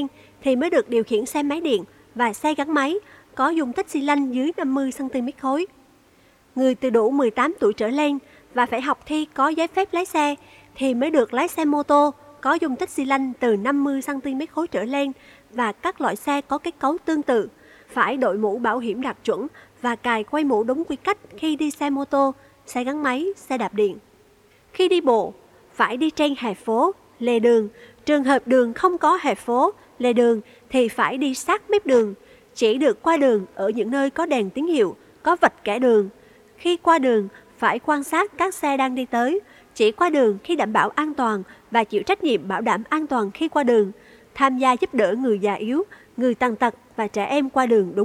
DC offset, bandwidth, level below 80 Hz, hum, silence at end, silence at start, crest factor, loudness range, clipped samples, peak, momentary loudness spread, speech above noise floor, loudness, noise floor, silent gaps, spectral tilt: under 0.1%; 15 kHz; -62 dBFS; none; 0 s; 0 s; 20 dB; 4 LU; under 0.1%; -2 dBFS; 8 LU; 35 dB; -22 LUFS; -56 dBFS; none; -4.5 dB/octave